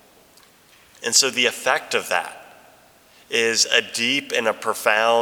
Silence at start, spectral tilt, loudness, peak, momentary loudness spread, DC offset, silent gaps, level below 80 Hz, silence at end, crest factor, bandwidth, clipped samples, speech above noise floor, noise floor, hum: 1 s; 0 dB/octave; -19 LUFS; -2 dBFS; 8 LU; under 0.1%; none; -70 dBFS; 0 s; 22 dB; over 20 kHz; under 0.1%; 32 dB; -53 dBFS; none